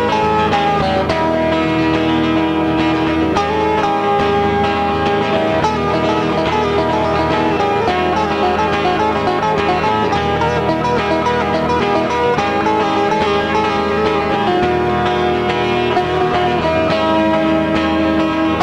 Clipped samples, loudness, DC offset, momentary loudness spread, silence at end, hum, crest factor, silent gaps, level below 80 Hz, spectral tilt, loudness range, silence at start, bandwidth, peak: under 0.1%; -15 LUFS; 0.1%; 1 LU; 0 s; none; 12 dB; none; -36 dBFS; -6 dB/octave; 0 LU; 0 s; 11 kHz; -2 dBFS